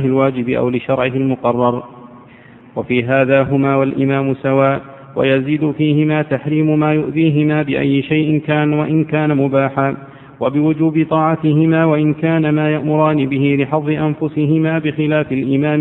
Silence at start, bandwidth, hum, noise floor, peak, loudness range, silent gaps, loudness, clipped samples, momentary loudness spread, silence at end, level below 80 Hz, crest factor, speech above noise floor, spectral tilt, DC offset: 0 s; 4 kHz; none; -41 dBFS; 0 dBFS; 2 LU; none; -15 LUFS; under 0.1%; 5 LU; 0 s; -52 dBFS; 14 dB; 27 dB; -10 dB/octave; under 0.1%